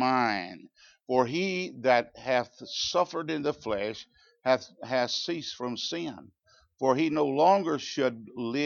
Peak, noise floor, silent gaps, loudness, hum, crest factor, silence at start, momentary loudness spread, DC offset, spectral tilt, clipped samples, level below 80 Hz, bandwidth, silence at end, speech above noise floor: -10 dBFS; -55 dBFS; none; -28 LUFS; none; 20 dB; 0 s; 11 LU; under 0.1%; -4.5 dB/octave; under 0.1%; -70 dBFS; 7.2 kHz; 0 s; 27 dB